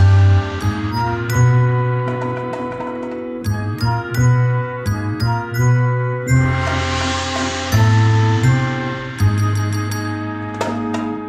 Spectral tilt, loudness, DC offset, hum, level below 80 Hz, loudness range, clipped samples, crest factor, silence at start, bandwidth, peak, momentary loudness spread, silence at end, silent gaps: -6 dB/octave; -18 LUFS; under 0.1%; none; -36 dBFS; 3 LU; under 0.1%; 14 dB; 0 s; 15 kHz; -2 dBFS; 10 LU; 0 s; none